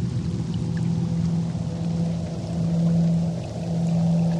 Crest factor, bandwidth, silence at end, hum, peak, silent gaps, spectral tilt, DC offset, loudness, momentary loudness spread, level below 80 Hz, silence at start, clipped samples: 12 dB; 9 kHz; 0 s; none; -12 dBFS; none; -8.5 dB/octave; under 0.1%; -25 LUFS; 6 LU; -46 dBFS; 0 s; under 0.1%